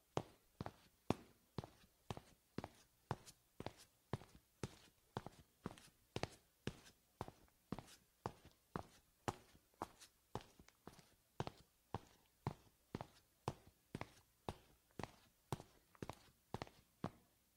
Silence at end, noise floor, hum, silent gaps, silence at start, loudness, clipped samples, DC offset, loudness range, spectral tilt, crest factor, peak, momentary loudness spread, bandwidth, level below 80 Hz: 0.35 s; -70 dBFS; none; none; 0.15 s; -54 LUFS; under 0.1%; under 0.1%; 2 LU; -5.5 dB/octave; 34 dB; -20 dBFS; 14 LU; 16 kHz; -72 dBFS